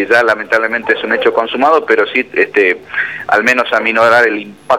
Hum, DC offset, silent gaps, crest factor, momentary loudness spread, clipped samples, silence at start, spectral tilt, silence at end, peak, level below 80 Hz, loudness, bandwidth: none; 0.2%; none; 12 dB; 5 LU; under 0.1%; 0 s; -3.5 dB/octave; 0 s; 0 dBFS; -58 dBFS; -12 LUFS; 15.5 kHz